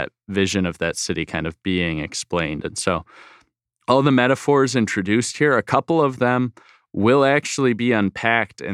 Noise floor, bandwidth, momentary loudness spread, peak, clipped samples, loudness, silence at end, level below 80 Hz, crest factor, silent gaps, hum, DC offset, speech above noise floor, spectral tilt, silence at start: -62 dBFS; 13 kHz; 9 LU; -2 dBFS; under 0.1%; -20 LUFS; 0 s; -50 dBFS; 18 dB; none; none; under 0.1%; 42 dB; -5 dB/octave; 0 s